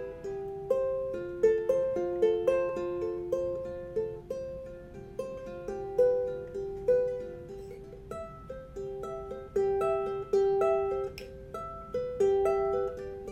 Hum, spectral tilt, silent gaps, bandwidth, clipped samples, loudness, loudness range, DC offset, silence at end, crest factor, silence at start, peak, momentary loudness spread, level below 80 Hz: none; -7 dB/octave; none; 10 kHz; under 0.1%; -31 LUFS; 5 LU; under 0.1%; 0 s; 18 dB; 0 s; -14 dBFS; 16 LU; -54 dBFS